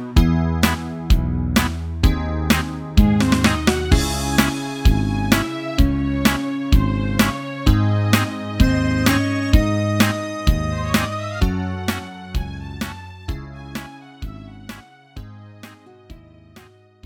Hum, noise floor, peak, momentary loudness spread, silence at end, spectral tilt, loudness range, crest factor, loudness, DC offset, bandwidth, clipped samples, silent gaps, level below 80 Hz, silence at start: none; -47 dBFS; 0 dBFS; 16 LU; 0.45 s; -5.5 dB/octave; 15 LU; 18 dB; -19 LUFS; under 0.1%; 19.5 kHz; under 0.1%; none; -24 dBFS; 0 s